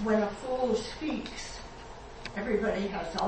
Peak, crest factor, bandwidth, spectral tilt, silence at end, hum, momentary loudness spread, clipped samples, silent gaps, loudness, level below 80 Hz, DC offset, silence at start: -14 dBFS; 18 dB; 8.8 kHz; -5 dB/octave; 0 s; none; 15 LU; under 0.1%; none; -32 LUFS; -50 dBFS; under 0.1%; 0 s